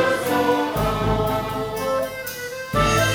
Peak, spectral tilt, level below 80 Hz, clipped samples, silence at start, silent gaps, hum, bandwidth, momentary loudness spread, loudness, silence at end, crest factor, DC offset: -4 dBFS; -4.5 dB/octave; -36 dBFS; under 0.1%; 0 s; none; none; over 20 kHz; 9 LU; -22 LUFS; 0 s; 16 dB; under 0.1%